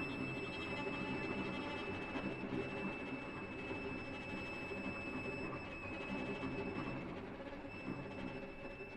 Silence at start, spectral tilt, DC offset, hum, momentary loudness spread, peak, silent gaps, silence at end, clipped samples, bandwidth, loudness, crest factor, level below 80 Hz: 0 s; -6.5 dB/octave; under 0.1%; none; 6 LU; -28 dBFS; none; 0 s; under 0.1%; 11 kHz; -44 LUFS; 16 dB; -60 dBFS